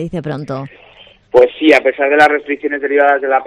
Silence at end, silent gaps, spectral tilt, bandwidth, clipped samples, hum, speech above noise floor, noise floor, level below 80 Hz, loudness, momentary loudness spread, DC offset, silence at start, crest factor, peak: 0 s; none; -6 dB/octave; 11.5 kHz; 0.3%; none; 31 dB; -43 dBFS; -50 dBFS; -12 LUFS; 13 LU; under 0.1%; 0 s; 14 dB; 0 dBFS